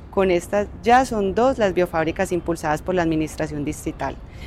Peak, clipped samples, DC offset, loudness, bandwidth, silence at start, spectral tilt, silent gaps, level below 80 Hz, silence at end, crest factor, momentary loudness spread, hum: -6 dBFS; under 0.1%; under 0.1%; -21 LUFS; 15 kHz; 0 s; -5.5 dB/octave; none; -40 dBFS; 0 s; 16 dB; 10 LU; none